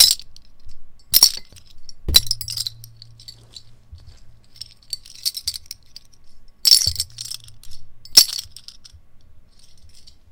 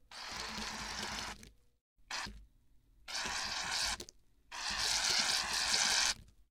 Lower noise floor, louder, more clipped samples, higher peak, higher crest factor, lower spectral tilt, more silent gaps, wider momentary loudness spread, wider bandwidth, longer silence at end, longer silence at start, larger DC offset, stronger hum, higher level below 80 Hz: second, -43 dBFS vs -66 dBFS; first, -16 LUFS vs -34 LUFS; neither; first, 0 dBFS vs -14 dBFS; about the same, 22 dB vs 24 dB; about the same, 0.5 dB/octave vs 0.5 dB/octave; second, none vs 1.81-1.96 s; first, 25 LU vs 15 LU; first, 19 kHz vs 17 kHz; about the same, 0.2 s vs 0.25 s; about the same, 0 s vs 0.1 s; neither; neither; first, -40 dBFS vs -58 dBFS